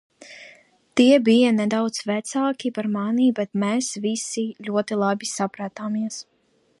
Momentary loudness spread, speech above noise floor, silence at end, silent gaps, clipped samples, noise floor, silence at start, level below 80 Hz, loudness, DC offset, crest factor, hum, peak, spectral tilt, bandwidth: 12 LU; 31 dB; 0.6 s; none; under 0.1%; -53 dBFS; 0.2 s; -74 dBFS; -22 LUFS; under 0.1%; 18 dB; none; -4 dBFS; -4.5 dB/octave; 11.5 kHz